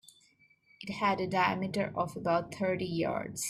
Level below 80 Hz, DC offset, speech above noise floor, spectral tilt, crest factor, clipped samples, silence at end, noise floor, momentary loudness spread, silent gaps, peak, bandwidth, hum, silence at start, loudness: -66 dBFS; under 0.1%; 34 dB; -4.5 dB/octave; 18 dB; under 0.1%; 0 s; -66 dBFS; 5 LU; none; -14 dBFS; 15.5 kHz; none; 0.8 s; -32 LUFS